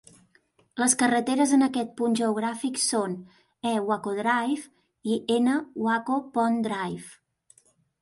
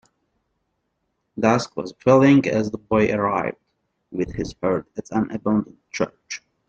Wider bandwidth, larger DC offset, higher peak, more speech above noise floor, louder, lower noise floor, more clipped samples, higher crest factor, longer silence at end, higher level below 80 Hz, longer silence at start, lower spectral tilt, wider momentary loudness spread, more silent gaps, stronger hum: first, 12 kHz vs 7.8 kHz; neither; second, -8 dBFS vs -2 dBFS; second, 39 dB vs 53 dB; second, -26 LUFS vs -21 LUFS; second, -65 dBFS vs -74 dBFS; neither; about the same, 20 dB vs 20 dB; first, 0.9 s vs 0.3 s; second, -72 dBFS vs -52 dBFS; second, 0.75 s vs 1.35 s; second, -3.5 dB/octave vs -6.5 dB/octave; second, 11 LU vs 15 LU; neither; neither